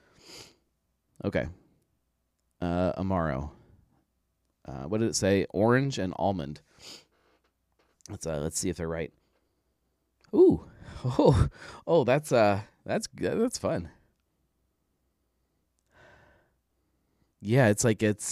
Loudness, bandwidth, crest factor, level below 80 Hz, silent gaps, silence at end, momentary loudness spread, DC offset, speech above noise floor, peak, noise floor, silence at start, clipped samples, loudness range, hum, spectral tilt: -27 LUFS; 15.5 kHz; 22 dB; -48 dBFS; none; 0 s; 21 LU; under 0.1%; 50 dB; -8 dBFS; -77 dBFS; 0.3 s; under 0.1%; 11 LU; none; -5.5 dB/octave